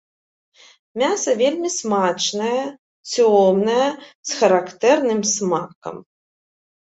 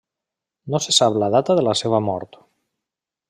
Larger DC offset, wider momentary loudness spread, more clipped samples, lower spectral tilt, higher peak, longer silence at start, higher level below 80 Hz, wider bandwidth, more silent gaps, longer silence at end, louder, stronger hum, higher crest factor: neither; first, 16 LU vs 10 LU; neither; about the same, -3.5 dB/octave vs -4 dB/octave; about the same, -2 dBFS vs -2 dBFS; first, 0.95 s vs 0.65 s; second, -68 dBFS vs -62 dBFS; second, 8.2 kHz vs 13.5 kHz; first, 2.79-3.04 s, 4.15-4.23 s, 5.75-5.82 s vs none; second, 0.9 s vs 1.05 s; about the same, -19 LUFS vs -18 LUFS; neither; about the same, 18 dB vs 20 dB